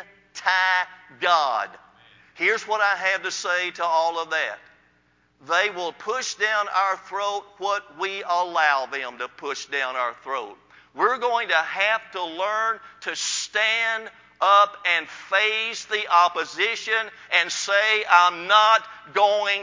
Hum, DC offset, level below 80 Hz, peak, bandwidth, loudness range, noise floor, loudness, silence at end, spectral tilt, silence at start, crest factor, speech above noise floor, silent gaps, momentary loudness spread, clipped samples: none; under 0.1%; -74 dBFS; -2 dBFS; 7.6 kHz; 6 LU; -63 dBFS; -22 LUFS; 0 s; 0 dB/octave; 0 s; 22 dB; 40 dB; none; 13 LU; under 0.1%